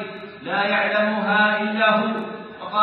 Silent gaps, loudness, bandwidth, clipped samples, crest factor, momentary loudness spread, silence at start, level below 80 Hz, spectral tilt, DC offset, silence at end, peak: none; -20 LUFS; 5.6 kHz; under 0.1%; 16 dB; 15 LU; 0 s; -72 dBFS; -8 dB/octave; under 0.1%; 0 s; -4 dBFS